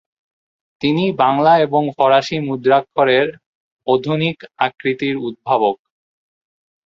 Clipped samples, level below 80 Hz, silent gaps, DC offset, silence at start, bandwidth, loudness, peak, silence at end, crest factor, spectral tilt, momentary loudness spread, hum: under 0.1%; -60 dBFS; 3.46-3.77 s; under 0.1%; 0.8 s; 7.4 kHz; -17 LUFS; 0 dBFS; 1.1 s; 18 dB; -6.5 dB/octave; 8 LU; none